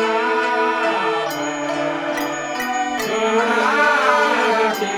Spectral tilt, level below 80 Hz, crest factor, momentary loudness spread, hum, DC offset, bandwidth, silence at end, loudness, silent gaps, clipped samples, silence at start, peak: -3 dB/octave; -60 dBFS; 16 dB; 8 LU; none; under 0.1%; over 20 kHz; 0 s; -18 LUFS; none; under 0.1%; 0 s; -4 dBFS